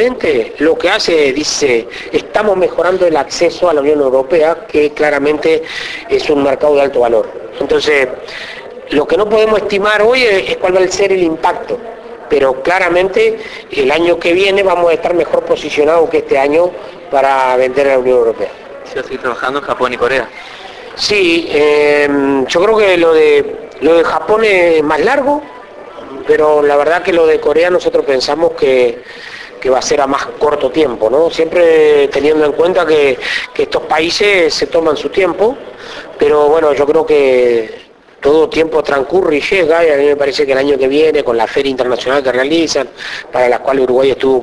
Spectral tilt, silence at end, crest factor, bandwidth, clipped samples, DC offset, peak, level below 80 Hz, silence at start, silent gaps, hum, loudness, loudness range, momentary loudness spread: -4 dB/octave; 0 s; 12 dB; 11 kHz; under 0.1%; under 0.1%; 0 dBFS; -44 dBFS; 0 s; none; none; -11 LUFS; 3 LU; 11 LU